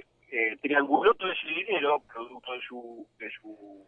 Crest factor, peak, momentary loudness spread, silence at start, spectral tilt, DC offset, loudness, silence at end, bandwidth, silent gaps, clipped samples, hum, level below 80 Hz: 22 dB; -8 dBFS; 19 LU; 0.3 s; -6 dB/octave; under 0.1%; -27 LUFS; 0.1 s; 4.1 kHz; none; under 0.1%; none; -70 dBFS